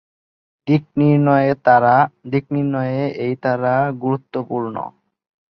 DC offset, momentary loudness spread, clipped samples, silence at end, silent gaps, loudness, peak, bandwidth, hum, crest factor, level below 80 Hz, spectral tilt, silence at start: under 0.1%; 11 LU; under 0.1%; 0.7 s; none; -18 LUFS; -2 dBFS; 5.8 kHz; none; 16 dB; -60 dBFS; -10.5 dB/octave; 0.65 s